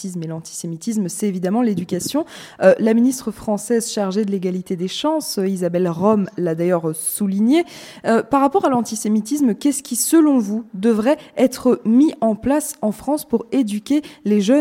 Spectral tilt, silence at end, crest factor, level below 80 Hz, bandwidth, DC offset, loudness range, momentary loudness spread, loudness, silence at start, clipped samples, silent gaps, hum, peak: -5.5 dB/octave; 0 s; 18 dB; -56 dBFS; 16.5 kHz; under 0.1%; 3 LU; 9 LU; -19 LUFS; 0 s; under 0.1%; none; none; 0 dBFS